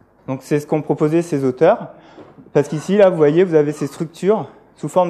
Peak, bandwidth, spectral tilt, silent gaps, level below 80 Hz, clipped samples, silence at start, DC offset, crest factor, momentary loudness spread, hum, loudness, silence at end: -2 dBFS; 13.5 kHz; -7 dB/octave; none; -62 dBFS; under 0.1%; 0.3 s; under 0.1%; 16 dB; 14 LU; none; -17 LUFS; 0 s